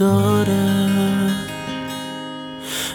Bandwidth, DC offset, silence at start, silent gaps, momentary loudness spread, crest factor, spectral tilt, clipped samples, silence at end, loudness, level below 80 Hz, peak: 19 kHz; under 0.1%; 0 s; none; 13 LU; 14 dB; -5.5 dB/octave; under 0.1%; 0 s; -20 LUFS; -52 dBFS; -6 dBFS